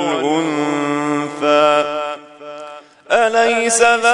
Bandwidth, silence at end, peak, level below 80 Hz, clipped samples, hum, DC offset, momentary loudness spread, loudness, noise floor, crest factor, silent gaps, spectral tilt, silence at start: 11 kHz; 0 s; 0 dBFS; -64 dBFS; under 0.1%; none; under 0.1%; 20 LU; -15 LUFS; -36 dBFS; 16 dB; none; -3 dB/octave; 0 s